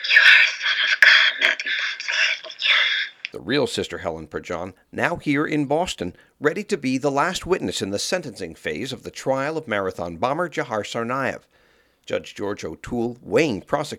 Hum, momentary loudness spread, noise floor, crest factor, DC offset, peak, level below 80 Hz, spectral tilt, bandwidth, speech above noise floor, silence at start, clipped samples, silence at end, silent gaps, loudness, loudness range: none; 16 LU; -60 dBFS; 22 dB; under 0.1%; 0 dBFS; -54 dBFS; -3 dB/octave; 17 kHz; 36 dB; 0 s; under 0.1%; 0 s; none; -20 LUFS; 9 LU